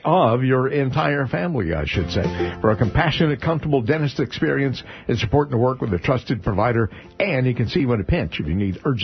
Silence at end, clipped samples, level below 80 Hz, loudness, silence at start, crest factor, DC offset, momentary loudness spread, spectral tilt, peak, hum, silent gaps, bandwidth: 0 s; under 0.1%; -38 dBFS; -21 LUFS; 0.05 s; 18 dB; under 0.1%; 5 LU; -5.5 dB/octave; -2 dBFS; none; none; 6.4 kHz